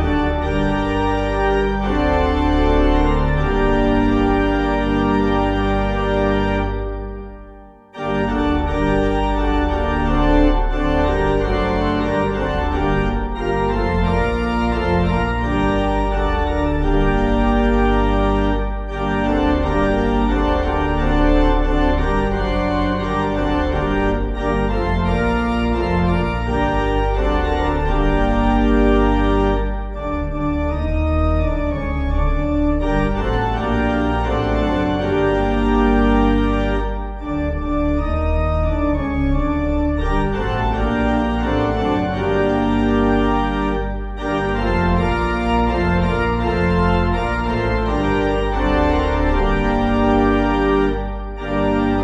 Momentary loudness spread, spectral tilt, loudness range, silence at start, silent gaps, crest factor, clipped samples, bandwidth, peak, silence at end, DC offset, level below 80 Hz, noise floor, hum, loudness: 5 LU; -8 dB/octave; 2 LU; 0 s; none; 14 dB; under 0.1%; 7.8 kHz; -2 dBFS; 0 s; under 0.1%; -22 dBFS; -41 dBFS; none; -19 LUFS